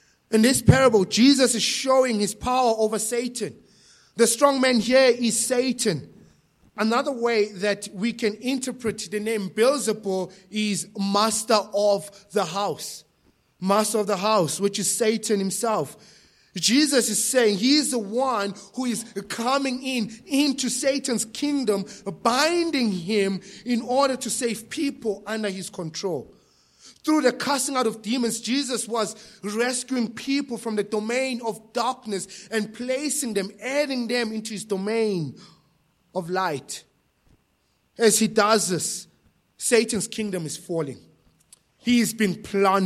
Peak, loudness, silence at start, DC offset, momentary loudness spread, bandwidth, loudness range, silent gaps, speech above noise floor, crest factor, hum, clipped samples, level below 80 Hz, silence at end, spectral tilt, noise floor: -2 dBFS; -23 LUFS; 0.3 s; under 0.1%; 12 LU; 15.5 kHz; 5 LU; none; 45 dB; 22 dB; none; under 0.1%; -56 dBFS; 0 s; -3.5 dB/octave; -68 dBFS